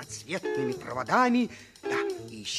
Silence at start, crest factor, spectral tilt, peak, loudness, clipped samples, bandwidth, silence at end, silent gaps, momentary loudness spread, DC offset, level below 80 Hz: 0 s; 18 dB; -4 dB/octave; -10 dBFS; -29 LUFS; under 0.1%; 14 kHz; 0 s; none; 11 LU; under 0.1%; -64 dBFS